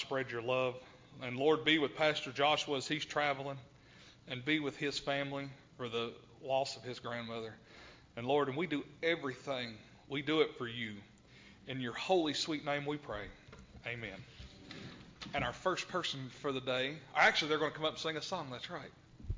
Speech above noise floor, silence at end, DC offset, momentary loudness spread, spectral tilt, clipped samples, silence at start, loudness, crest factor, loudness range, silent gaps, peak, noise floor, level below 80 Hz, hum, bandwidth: 23 dB; 0 s; under 0.1%; 19 LU; -4 dB/octave; under 0.1%; 0 s; -36 LUFS; 22 dB; 7 LU; none; -16 dBFS; -60 dBFS; -62 dBFS; none; 7.6 kHz